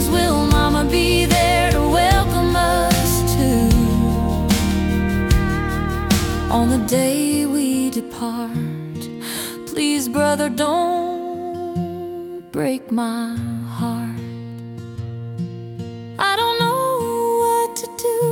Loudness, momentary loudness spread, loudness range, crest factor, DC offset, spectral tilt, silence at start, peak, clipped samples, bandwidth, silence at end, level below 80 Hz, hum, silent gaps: -19 LUFS; 14 LU; 9 LU; 14 dB; under 0.1%; -5 dB/octave; 0 s; -4 dBFS; under 0.1%; 18 kHz; 0 s; -28 dBFS; none; none